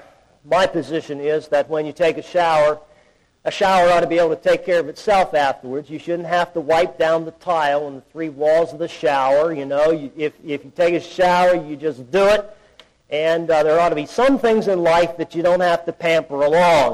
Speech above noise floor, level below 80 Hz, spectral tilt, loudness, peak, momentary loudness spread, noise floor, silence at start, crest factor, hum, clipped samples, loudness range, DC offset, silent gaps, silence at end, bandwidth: 39 dB; -50 dBFS; -5 dB/octave; -18 LUFS; -8 dBFS; 11 LU; -56 dBFS; 0.45 s; 10 dB; none; under 0.1%; 3 LU; under 0.1%; none; 0 s; 13 kHz